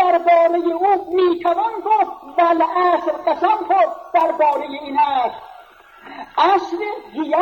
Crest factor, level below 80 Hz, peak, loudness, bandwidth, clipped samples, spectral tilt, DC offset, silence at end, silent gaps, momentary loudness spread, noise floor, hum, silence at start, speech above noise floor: 14 dB; -62 dBFS; -4 dBFS; -17 LUFS; 17 kHz; under 0.1%; -4.5 dB/octave; under 0.1%; 0 s; none; 10 LU; -44 dBFS; none; 0 s; 27 dB